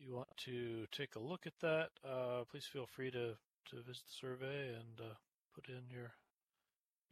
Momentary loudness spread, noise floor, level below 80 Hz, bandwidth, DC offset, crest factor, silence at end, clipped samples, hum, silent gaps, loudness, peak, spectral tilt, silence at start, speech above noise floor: 15 LU; under -90 dBFS; -86 dBFS; 14 kHz; under 0.1%; 20 dB; 0.95 s; under 0.1%; none; 3.60-3.64 s, 5.34-5.50 s; -47 LUFS; -28 dBFS; -5.5 dB/octave; 0 s; over 43 dB